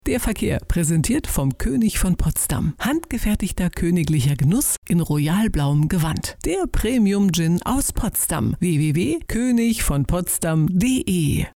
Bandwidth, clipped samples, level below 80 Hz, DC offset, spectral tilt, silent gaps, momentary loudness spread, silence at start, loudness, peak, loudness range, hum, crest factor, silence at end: 18 kHz; under 0.1%; -30 dBFS; under 0.1%; -5.5 dB/octave; 4.78-4.82 s; 4 LU; 0.05 s; -20 LUFS; -10 dBFS; 1 LU; none; 10 dB; 0.05 s